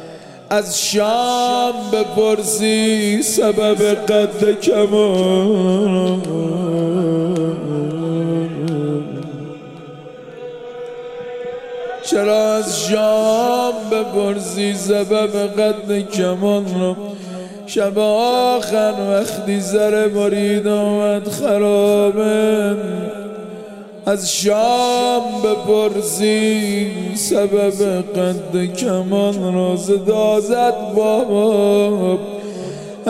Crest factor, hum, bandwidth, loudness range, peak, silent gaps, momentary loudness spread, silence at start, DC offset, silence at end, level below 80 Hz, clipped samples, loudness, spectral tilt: 14 dB; none; 16 kHz; 6 LU; -2 dBFS; none; 14 LU; 0 s; 0.2%; 0 s; -60 dBFS; under 0.1%; -17 LUFS; -4.5 dB/octave